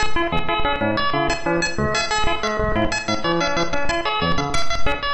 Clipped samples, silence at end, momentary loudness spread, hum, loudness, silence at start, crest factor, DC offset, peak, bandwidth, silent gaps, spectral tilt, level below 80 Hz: under 0.1%; 0 s; 2 LU; none; -21 LUFS; 0 s; 10 dB; under 0.1%; -8 dBFS; 11 kHz; none; -4 dB/octave; -32 dBFS